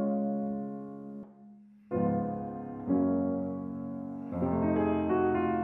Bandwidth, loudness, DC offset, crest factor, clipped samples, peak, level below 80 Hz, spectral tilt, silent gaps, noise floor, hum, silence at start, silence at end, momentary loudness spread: 3.6 kHz; -32 LUFS; under 0.1%; 16 dB; under 0.1%; -16 dBFS; -64 dBFS; -11.5 dB/octave; none; -54 dBFS; none; 0 s; 0 s; 14 LU